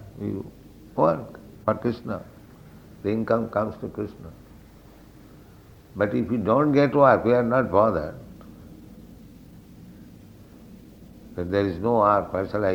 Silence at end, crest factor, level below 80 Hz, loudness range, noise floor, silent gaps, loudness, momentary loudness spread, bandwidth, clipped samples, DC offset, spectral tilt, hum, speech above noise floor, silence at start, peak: 0 s; 22 dB; -52 dBFS; 9 LU; -49 dBFS; none; -23 LUFS; 24 LU; 19.5 kHz; under 0.1%; under 0.1%; -8.5 dB/octave; none; 26 dB; 0 s; -4 dBFS